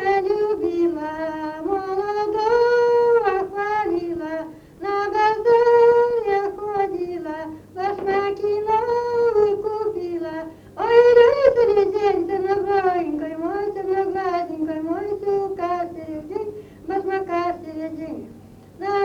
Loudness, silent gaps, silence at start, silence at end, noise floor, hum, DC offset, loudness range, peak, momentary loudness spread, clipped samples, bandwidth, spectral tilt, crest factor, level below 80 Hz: -21 LUFS; none; 0 s; 0 s; -44 dBFS; none; under 0.1%; 8 LU; -2 dBFS; 15 LU; under 0.1%; 7 kHz; -6 dB/octave; 18 dB; -54 dBFS